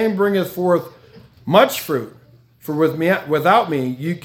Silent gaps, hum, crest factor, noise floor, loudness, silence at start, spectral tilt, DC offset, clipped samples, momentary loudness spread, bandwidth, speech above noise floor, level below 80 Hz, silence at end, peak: none; none; 18 dB; -45 dBFS; -18 LUFS; 0 s; -5.5 dB/octave; under 0.1%; under 0.1%; 17 LU; 18 kHz; 28 dB; -62 dBFS; 0.05 s; 0 dBFS